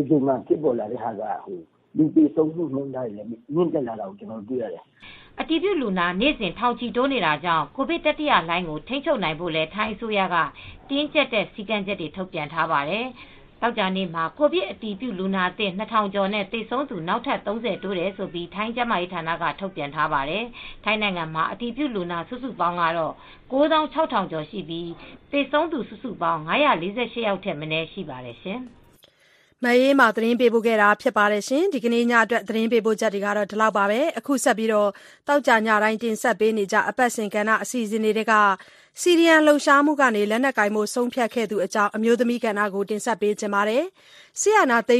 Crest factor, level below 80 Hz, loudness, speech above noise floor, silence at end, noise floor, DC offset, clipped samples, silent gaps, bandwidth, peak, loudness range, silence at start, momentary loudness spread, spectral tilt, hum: 20 dB; -54 dBFS; -22 LUFS; 36 dB; 0 s; -59 dBFS; under 0.1%; under 0.1%; none; 14.5 kHz; -2 dBFS; 7 LU; 0 s; 12 LU; -4.5 dB/octave; none